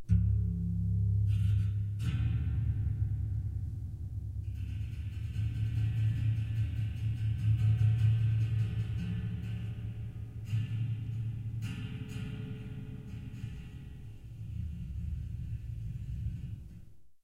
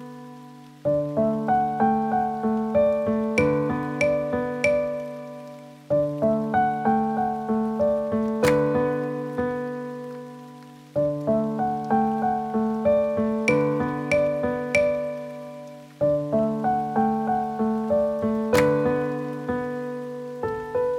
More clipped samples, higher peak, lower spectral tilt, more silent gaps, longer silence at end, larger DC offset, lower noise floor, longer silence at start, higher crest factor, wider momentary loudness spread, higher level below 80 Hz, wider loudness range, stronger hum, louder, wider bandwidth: neither; second, -16 dBFS vs -8 dBFS; first, -8.5 dB/octave vs -7 dB/octave; neither; about the same, 0.1 s vs 0 s; neither; first, -53 dBFS vs -44 dBFS; about the same, 0 s vs 0 s; about the same, 18 dB vs 16 dB; about the same, 14 LU vs 13 LU; first, -42 dBFS vs -52 dBFS; first, 11 LU vs 3 LU; neither; second, -35 LUFS vs -24 LUFS; second, 4.8 kHz vs 16 kHz